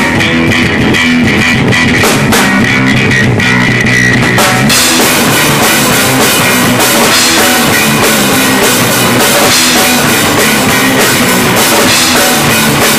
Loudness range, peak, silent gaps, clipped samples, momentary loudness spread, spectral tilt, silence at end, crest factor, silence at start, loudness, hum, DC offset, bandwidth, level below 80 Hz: 1 LU; 0 dBFS; none; under 0.1%; 2 LU; -3 dB/octave; 0 s; 8 dB; 0 s; -6 LUFS; none; 0.4%; 16 kHz; -32 dBFS